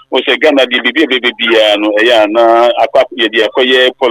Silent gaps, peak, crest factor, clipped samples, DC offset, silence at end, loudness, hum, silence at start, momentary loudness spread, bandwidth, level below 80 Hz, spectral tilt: none; 0 dBFS; 10 dB; under 0.1%; under 0.1%; 0 s; -9 LUFS; none; 0.1 s; 3 LU; 15 kHz; -56 dBFS; -3 dB/octave